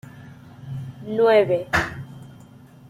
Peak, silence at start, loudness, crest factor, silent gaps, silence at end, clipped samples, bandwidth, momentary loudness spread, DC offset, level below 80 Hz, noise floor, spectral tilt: -6 dBFS; 0.05 s; -20 LUFS; 18 dB; none; 0.55 s; under 0.1%; 15.5 kHz; 25 LU; under 0.1%; -50 dBFS; -46 dBFS; -6 dB/octave